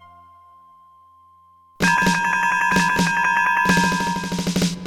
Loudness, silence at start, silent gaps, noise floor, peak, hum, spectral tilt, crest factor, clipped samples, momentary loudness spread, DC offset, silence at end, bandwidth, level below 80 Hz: -18 LUFS; 1.8 s; none; -53 dBFS; -4 dBFS; none; -4 dB/octave; 16 dB; under 0.1%; 6 LU; under 0.1%; 0 s; 18 kHz; -48 dBFS